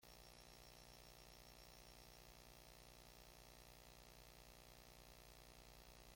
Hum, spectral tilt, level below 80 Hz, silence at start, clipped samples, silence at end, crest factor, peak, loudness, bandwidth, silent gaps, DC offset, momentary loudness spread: 60 Hz at -75 dBFS; -3 dB/octave; -70 dBFS; 0 s; under 0.1%; 0 s; 16 dB; -46 dBFS; -63 LUFS; 16.5 kHz; none; under 0.1%; 1 LU